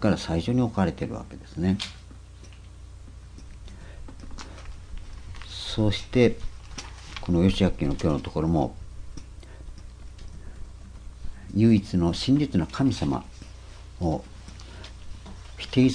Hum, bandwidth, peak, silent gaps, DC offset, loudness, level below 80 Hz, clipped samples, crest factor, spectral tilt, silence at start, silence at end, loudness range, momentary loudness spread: none; 10.5 kHz; -6 dBFS; none; under 0.1%; -25 LUFS; -40 dBFS; under 0.1%; 20 dB; -7 dB/octave; 0 s; 0 s; 10 LU; 23 LU